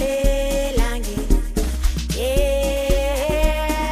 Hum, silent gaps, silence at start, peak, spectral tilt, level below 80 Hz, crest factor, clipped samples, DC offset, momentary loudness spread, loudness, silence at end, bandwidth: none; none; 0 s; -2 dBFS; -5 dB/octave; -22 dBFS; 16 dB; under 0.1%; under 0.1%; 4 LU; -21 LUFS; 0 s; 15.5 kHz